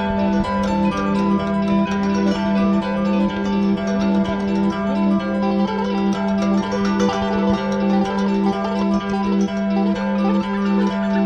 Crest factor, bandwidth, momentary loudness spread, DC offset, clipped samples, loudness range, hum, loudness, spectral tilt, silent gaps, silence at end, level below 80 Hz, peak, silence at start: 12 dB; 7.6 kHz; 1 LU; under 0.1%; under 0.1%; 1 LU; none; -19 LUFS; -7.5 dB/octave; none; 0 s; -42 dBFS; -6 dBFS; 0 s